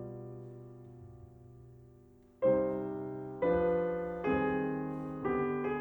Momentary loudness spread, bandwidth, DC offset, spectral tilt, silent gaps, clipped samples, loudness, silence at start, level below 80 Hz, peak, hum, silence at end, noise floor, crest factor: 22 LU; 19.5 kHz; under 0.1%; -9.5 dB/octave; none; under 0.1%; -33 LUFS; 0 s; -60 dBFS; -18 dBFS; none; 0 s; -60 dBFS; 16 dB